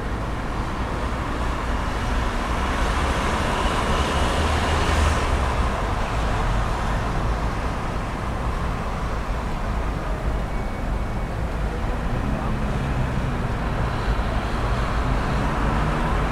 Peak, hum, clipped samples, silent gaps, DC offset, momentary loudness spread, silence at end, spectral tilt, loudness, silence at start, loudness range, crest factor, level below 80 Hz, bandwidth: -8 dBFS; none; under 0.1%; none; under 0.1%; 6 LU; 0 s; -5.5 dB/octave; -25 LUFS; 0 s; 5 LU; 16 dB; -26 dBFS; 13.5 kHz